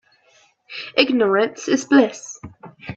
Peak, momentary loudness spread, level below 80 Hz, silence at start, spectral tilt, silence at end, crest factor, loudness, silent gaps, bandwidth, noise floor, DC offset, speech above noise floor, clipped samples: 0 dBFS; 19 LU; -62 dBFS; 0.7 s; -4 dB/octave; 0 s; 20 dB; -18 LUFS; none; 8 kHz; -57 dBFS; under 0.1%; 39 dB; under 0.1%